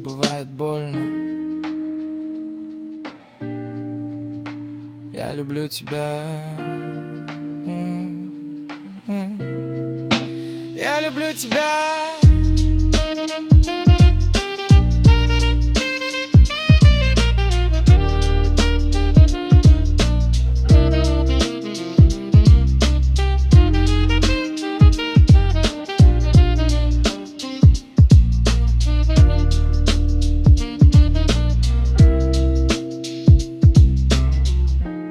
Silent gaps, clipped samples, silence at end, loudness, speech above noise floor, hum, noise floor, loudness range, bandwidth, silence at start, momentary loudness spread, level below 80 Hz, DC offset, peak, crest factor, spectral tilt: none; under 0.1%; 0 s; -17 LUFS; 12 dB; none; -36 dBFS; 13 LU; 11.5 kHz; 0 s; 16 LU; -18 dBFS; under 0.1%; -2 dBFS; 14 dB; -6.5 dB/octave